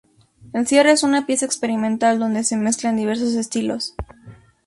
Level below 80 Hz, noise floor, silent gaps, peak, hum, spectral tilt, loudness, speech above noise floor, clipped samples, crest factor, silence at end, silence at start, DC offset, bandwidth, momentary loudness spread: -48 dBFS; -48 dBFS; none; -2 dBFS; none; -3.5 dB/octave; -19 LUFS; 30 dB; under 0.1%; 18 dB; 0.3 s; 0.45 s; under 0.1%; 11.5 kHz; 12 LU